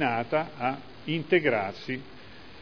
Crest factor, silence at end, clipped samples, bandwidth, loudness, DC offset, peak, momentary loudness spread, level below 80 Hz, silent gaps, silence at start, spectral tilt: 20 dB; 0 s; under 0.1%; 5.4 kHz; -29 LUFS; 0.4%; -8 dBFS; 21 LU; -62 dBFS; none; 0 s; -7.5 dB/octave